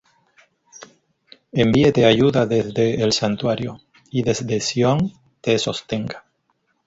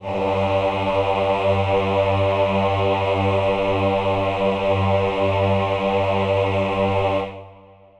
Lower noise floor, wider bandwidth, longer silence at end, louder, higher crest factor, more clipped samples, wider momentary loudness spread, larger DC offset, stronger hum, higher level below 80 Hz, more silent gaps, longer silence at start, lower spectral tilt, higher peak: first, -68 dBFS vs -47 dBFS; about the same, 8 kHz vs 8.6 kHz; first, 0.65 s vs 0.45 s; about the same, -19 LUFS vs -20 LUFS; first, 20 dB vs 14 dB; neither; first, 12 LU vs 2 LU; neither; neither; second, -50 dBFS vs -44 dBFS; neither; first, 1.55 s vs 0 s; second, -5.5 dB/octave vs -7.5 dB/octave; first, 0 dBFS vs -6 dBFS